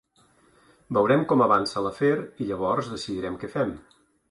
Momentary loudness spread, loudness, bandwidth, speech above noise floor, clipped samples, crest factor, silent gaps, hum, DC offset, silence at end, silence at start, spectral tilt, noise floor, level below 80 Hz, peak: 11 LU; -25 LUFS; 11.5 kHz; 37 dB; under 0.1%; 18 dB; none; none; under 0.1%; 0.5 s; 0.9 s; -6.5 dB/octave; -61 dBFS; -58 dBFS; -8 dBFS